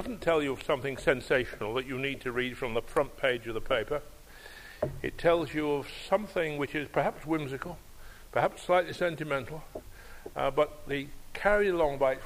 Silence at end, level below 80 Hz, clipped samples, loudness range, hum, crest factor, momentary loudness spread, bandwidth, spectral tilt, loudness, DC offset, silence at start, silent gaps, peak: 0 s; -48 dBFS; under 0.1%; 2 LU; none; 20 dB; 15 LU; 15.5 kHz; -5.5 dB/octave; -31 LUFS; under 0.1%; 0 s; none; -10 dBFS